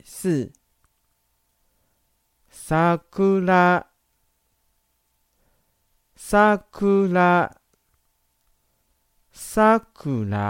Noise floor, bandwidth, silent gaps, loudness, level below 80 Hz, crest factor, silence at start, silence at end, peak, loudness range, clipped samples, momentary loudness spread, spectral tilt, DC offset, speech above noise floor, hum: -70 dBFS; 16.5 kHz; none; -20 LUFS; -52 dBFS; 18 dB; 0.1 s; 0 s; -4 dBFS; 3 LU; under 0.1%; 12 LU; -6.5 dB/octave; under 0.1%; 50 dB; none